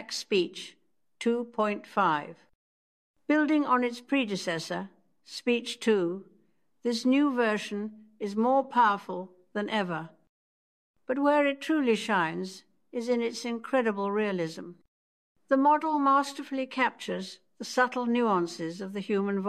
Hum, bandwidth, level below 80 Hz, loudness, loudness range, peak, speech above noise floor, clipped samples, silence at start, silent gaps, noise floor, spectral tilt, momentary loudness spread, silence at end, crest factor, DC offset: none; 13.5 kHz; -84 dBFS; -28 LUFS; 3 LU; -12 dBFS; 41 dB; under 0.1%; 0 s; 2.55-3.14 s, 10.29-10.94 s, 14.88-15.35 s; -69 dBFS; -5 dB/octave; 14 LU; 0 s; 18 dB; under 0.1%